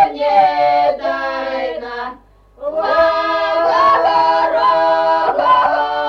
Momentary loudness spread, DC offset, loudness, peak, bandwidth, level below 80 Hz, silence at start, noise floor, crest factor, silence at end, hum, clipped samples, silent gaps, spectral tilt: 11 LU; under 0.1%; -14 LUFS; -2 dBFS; 7 kHz; -50 dBFS; 0 s; -42 dBFS; 12 dB; 0 s; none; under 0.1%; none; -4.5 dB/octave